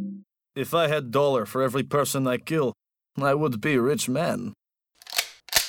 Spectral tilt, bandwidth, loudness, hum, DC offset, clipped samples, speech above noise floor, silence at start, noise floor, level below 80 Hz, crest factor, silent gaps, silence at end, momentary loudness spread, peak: -4 dB/octave; over 20 kHz; -25 LUFS; none; under 0.1%; under 0.1%; 31 dB; 0 s; -55 dBFS; -62 dBFS; 18 dB; none; 0 s; 11 LU; -6 dBFS